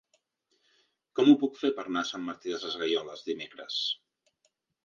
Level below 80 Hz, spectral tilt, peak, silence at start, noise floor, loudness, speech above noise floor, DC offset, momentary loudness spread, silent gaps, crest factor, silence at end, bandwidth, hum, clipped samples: -80 dBFS; -4.5 dB/octave; -8 dBFS; 1.15 s; -76 dBFS; -29 LUFS; 47 dB; under 0.1%; 14 LU; none; 22 dB; 0.9 s; 7.2 kHz; none; under 0.1%